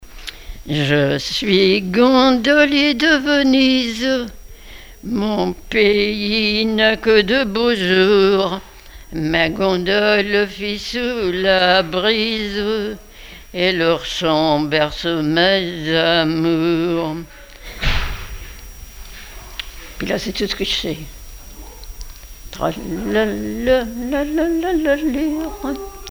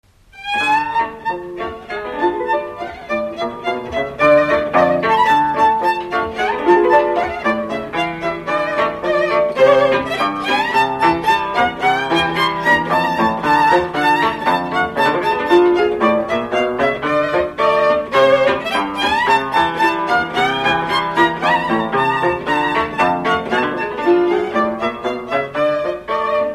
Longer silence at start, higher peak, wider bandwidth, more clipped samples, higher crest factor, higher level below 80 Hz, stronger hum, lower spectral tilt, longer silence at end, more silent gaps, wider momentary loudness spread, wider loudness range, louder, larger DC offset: second, 0 s vs 0.35 s; about the same, 0 dBFS vs 0 dBFS; first, over 20 kHz vs 14 kHz; neither; about the same, 18 dB vs 16 dB; first, -36 dBFS vs -46 dBFS; neither; about the same, -5 dB/octave vs -5 dB/octave; about the same, 0 s vs 0 s; neither; first, 21 LU vs 8 LU; first, 10 LU vs 3 LU; about the same, -17 LUFS vs -16 LUFS; neither